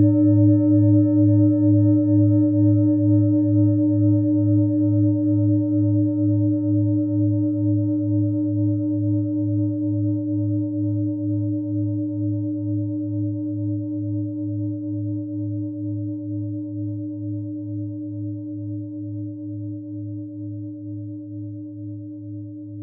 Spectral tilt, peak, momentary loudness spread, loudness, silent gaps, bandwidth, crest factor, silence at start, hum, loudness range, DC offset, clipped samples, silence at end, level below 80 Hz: -17.5 dB/octave; -6 dBFS; 16 LU; -21 LUFS; none; 1.4 kHz; 14 dB; 0 s; none; 14 LU; under 0.1%; under 0.1%; 0 s; -64 dBFS